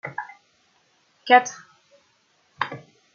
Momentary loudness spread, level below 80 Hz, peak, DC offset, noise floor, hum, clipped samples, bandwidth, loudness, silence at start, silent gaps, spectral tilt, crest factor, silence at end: 24 LU; -80 dBFS; -2 dBFS; under 0.1%; -64 dBFS; none; under 0.1%; 7 kHz; -21 LUFS; 0.05 s; none; -2.5 dB/octave; 24 dB; 0.4 s